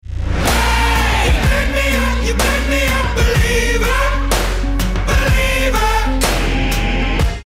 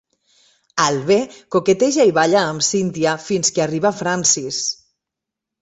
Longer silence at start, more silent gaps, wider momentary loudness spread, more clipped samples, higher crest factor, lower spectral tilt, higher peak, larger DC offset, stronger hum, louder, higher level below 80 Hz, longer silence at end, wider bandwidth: second, 0.05 s vs 0.75 s; neither; second, 4 LU vs 7 LU; neither; second, 10 dB vs 18 dB; about the same, -4 dB/octave vs -3 dB/octave; second, -4 dBFS vs 0 dBFS; neither; neither; about the same, -16 LUFS vs -17 LUFS; first, -18 dBFS vs -60 dBFS; second, 0.05 s vs 0.85 s; first, 16 kHz vs 8.4 kHz